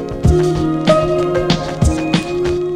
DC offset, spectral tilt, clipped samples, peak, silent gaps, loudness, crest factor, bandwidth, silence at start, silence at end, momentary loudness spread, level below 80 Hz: under 0.1%; -6.5 dB/octave; under 0.1%; -2 dBFS; none; -15 LUFS; 14 dB; 13 kHz; 0 s; 0 s; 4 LU; -24 dBFS